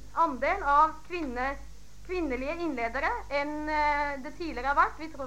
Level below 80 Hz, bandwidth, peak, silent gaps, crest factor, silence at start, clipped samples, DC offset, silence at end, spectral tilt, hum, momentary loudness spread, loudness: -46 dBFS; 16 kHz; -10 dBFS; none; 20 dB; 0 s; under 0.1%; 0.7%; 0 s; -5 dB/octave; 50 Hz at -50 dBFS; 11 LU; -29 LUFS